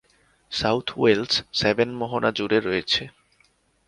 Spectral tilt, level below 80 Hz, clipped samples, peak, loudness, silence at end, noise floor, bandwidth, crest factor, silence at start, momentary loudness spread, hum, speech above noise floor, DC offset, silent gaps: -4.5 dB/octave; -54 dBFS; under 0.1%; -4 dBFS; -23 LUFS; 0.75 s; -63 dBFS; 10.5 kHz; 20 dB; 0.5 s; 4 LU; none; 40 dB; under 0.1%; none